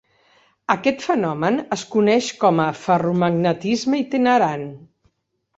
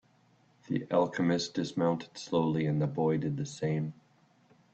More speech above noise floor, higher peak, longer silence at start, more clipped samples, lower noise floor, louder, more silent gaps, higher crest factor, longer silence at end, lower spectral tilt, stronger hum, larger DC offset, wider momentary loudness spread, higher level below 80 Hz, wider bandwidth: first, 52 dB vs 35 dB; first, -2 dBFS vs -14 dBFS; about the same, 0.7 s vs 0.7 s; neither; first, -71 dBFS vs -66 dBFS; first, -19 LUFS vs -31 LUFS; neither; about the same, 18 dB vs 18 dB; about the same, 0.8 s vs 0.8 s; about the same, -6 dB/octave vs -6.5 dB/octave; neither; neither; about the same, 6 LU vs 7 LU; first, -62 dBFS vs -68 dBFS; about the same, 8 kHz vs 8.6 kHz